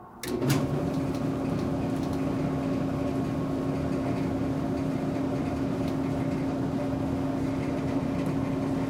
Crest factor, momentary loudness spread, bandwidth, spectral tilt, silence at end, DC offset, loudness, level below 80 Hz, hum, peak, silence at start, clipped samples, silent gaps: 18 dB; 1 LU; 16 kHz; -7.5 dB/octave; 0 s; under 0.1%; -29 LUFS; -48 dBFS; none; -10 dBFS; 0 s; under 0.1%; none